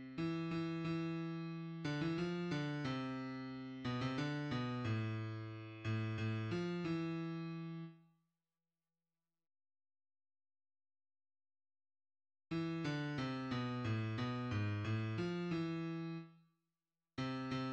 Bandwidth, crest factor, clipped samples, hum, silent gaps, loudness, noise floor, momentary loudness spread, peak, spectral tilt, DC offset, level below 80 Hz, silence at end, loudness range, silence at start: 8.4 kHz; 16 dB; under 0.1%; none; none; -42 LUFS; under -90 dBFS; 6 LU; -28 dBFS; -7 dB/octave; under 0.1%; -70 dBFS; 0 s; 7 LU; 0 s